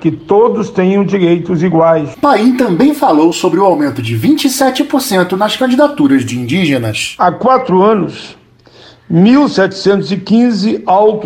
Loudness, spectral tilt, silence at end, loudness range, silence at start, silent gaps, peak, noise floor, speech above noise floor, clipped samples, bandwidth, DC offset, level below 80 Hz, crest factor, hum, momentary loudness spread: -11 LUFS; -6 dB/octave; 0 s; 2 LU; 0 s; none; 0 dBFS; -41 dBFS; 30 dB; under 0.1%; 17 kHz; under 0.1%; -50 dBFS; 10 dB; none; 5 LU